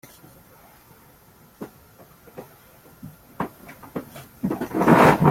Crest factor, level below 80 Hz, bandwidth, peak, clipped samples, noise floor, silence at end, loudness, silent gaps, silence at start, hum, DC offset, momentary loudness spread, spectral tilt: 22 dB; -54 dBFS; 16.5 kHz; -2 dBFS; under 0.1%; -52 dBFS; 0 s; -20 LUFS; none; 1.6 s; none; under 0.1%; 30 LU; -7 dB/octave